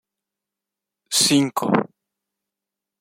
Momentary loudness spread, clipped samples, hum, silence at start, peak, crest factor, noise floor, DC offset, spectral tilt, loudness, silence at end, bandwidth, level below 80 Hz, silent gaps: 7 LU; under 0.1%; none; 1.1 s; -2 dBFS; 22 dB; -86 dBFS; under 0.1%; -3 dB/octave; -19 LUFS; 1.15 s; 16.5 kHz; -66 dBFS; none